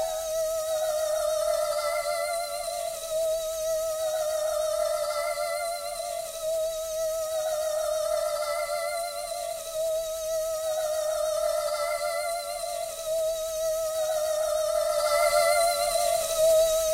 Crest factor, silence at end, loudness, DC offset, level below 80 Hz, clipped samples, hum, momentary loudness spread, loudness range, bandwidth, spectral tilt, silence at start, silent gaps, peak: 16 dB; 0 s; -27 LUFS; under 0.1%; -54 dBFS; under 0.1%; none; 9 LU; 4 LU; 16 kHz; 0.5 dB/octave; 0 s; none; -10 dBFS